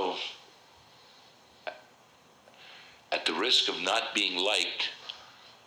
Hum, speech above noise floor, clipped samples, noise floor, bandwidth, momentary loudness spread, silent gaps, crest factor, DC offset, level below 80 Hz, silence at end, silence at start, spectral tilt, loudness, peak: none; 31 dB; under 0.1%; -59 dBFS; over 20 kHz; 25 LU; none; 22 dB; under 0.1%; -80 dBFS; 0.15 s; 0 s; -0.5 dB/octave; -28 LUFS; -12 dBFS